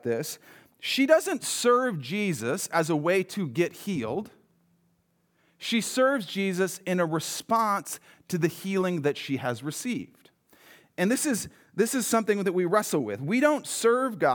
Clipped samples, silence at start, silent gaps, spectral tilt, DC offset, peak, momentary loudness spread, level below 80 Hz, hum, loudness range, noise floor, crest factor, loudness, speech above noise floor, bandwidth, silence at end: under 0.1%; 0.05 s; none; -4.5 dB/octave; under 0.1%; -8 dBFS; 11 LU; -74 dBFS; none; 4 LU; -70 dBFS; 20 dB; -27 LUFS; 43 dB; over 20 kHz; 0 s